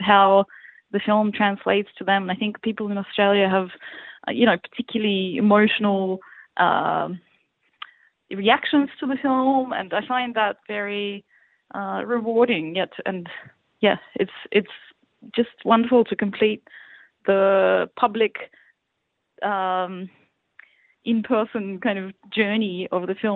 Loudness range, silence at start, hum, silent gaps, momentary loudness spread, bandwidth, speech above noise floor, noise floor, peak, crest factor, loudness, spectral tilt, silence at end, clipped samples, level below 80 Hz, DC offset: 5 LU; 0 s; none; none; 16 LU; 4.3 kHz; 55 dB; -76 dBFS; -2 dBFS; 20 dB; -22 LUFS; -9 dB/octave; 0 s; under 0.1%; -68 dBFS; under 0.1%